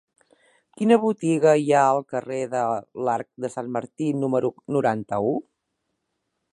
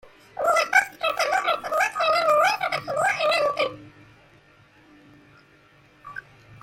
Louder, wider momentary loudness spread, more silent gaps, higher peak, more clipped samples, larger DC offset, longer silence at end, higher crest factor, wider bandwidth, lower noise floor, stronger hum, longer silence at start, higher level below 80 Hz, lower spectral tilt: about the same, -23 LUFS vs -22 LUFS; second, 11 LU vs 21 LU; neither; about the same, -4 dBFS vs -6 dBFS; neither; neither; first, 1.15 s vs 0.05 s; about the same, 20 dB vs 18 dB; second, 11.5 kHz vs 16.5 kHz; first, -77 dBFS vs -55 dBFS; neither; first, 0.8 s vs 0.35 s; about the same, -68 dBFS vs -66 dBFS; first, -6.5 dB/octave vs -1.5 dB/octave